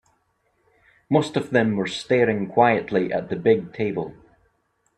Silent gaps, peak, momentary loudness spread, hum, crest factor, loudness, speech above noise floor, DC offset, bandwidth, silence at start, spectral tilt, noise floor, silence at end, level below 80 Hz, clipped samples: none; -2 dBFS; 8 LU; none; 20 dB; -22 LUFS; 47 dB; under 0.1%; 10 kHz; 1.1 s; -6.5 dB/octave; -68 dBFS; 0.85 s; -60 dBFS; under 0.1%